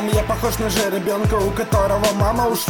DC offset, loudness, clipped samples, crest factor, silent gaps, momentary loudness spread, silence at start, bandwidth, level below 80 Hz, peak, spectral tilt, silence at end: under 0.1%; -19 LUFS; under 0.1%; 14 dB; none; 3 LU; 0 s; over 20 kHz; -30 dBFS; -4 dBFS; -5 dB/octave; 0 s